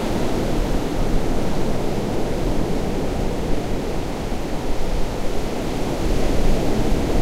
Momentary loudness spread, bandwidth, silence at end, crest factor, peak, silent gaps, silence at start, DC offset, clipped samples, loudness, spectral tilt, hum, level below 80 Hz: 5 LU; 15 kHz; 0 s; 14 dB; -6 dBFS; none; 0 s; under 0.1%; under 0.1%; -24 LUFS; -6 dB/octave; none; -24 dBFS